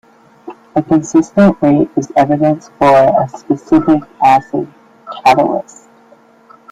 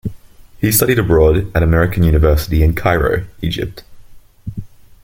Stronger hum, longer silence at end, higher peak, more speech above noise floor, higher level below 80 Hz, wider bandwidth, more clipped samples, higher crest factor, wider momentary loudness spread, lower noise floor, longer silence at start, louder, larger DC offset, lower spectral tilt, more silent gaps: neither; first, 1.1 s vs 0.4 s; about the same, 0 dBFS vs 0 dBFS; first, 34 dB vs 25 dB; second, -48 dBFS vs -24 dBFS; second, 10 kHz vs 17 kHz; neither; about the same, 12 dB vs 14 dB; second, 10 LU vs 18 LU; first, -45 dBFS vs -38 dBFS; first, 0.45 s vs 0.05 s; about the same, -12 LUFS vs -14 LUFS; neither; first, -7 dB/octave vs -5.5 dB/octave; neither